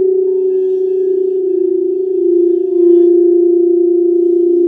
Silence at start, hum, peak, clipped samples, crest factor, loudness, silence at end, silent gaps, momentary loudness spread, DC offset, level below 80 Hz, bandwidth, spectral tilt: 0 s; none; 0 dBFS; under 0.1%; 10 dB; -12 LUFS; 0 s; none; 6 LU; under 0.1%; -70 dBFS; 0.9 kHz; -9.5 dB/octave